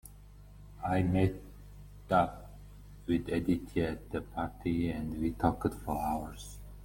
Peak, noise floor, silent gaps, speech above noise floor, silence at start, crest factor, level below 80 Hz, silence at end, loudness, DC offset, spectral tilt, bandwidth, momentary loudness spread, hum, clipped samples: -12 dBFS; -53 dBFS; none; 20 dB; 0.05 s; 22 dB; -48 dBFS; 0 s; -33 LUFS; under 0.1%; -7.5 dB/octave; 17 kHz; 23 LU; 50 Hz at -45 dBFS; under 0.1%